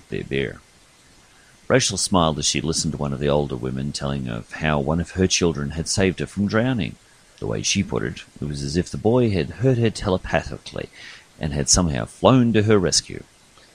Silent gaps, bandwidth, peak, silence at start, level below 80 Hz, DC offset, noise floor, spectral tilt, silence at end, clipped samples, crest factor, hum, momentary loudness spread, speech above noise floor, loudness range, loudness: none; 15.5 kHz; 0 dBFS; 0.1 s; -40 dBFS; under 0.1%; -52 dBFS; -4.5 dB/octave; 0.5 s; under 0.1%; 22 dB; none; 13 LU; 31 dB; 3 LU; -21 LUFS